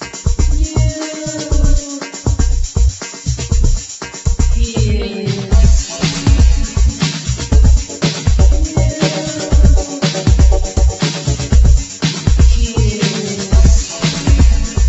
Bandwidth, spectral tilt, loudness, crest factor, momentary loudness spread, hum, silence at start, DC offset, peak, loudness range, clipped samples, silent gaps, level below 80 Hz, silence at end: 8.2 kHz; -5 dB/octave; -15 LUFS; 12 dB; 8 LU; none; 0 s; under 0.1%; 0 dBFS; 4 LU; under 0.1%; none; -14 dBFS; 0 s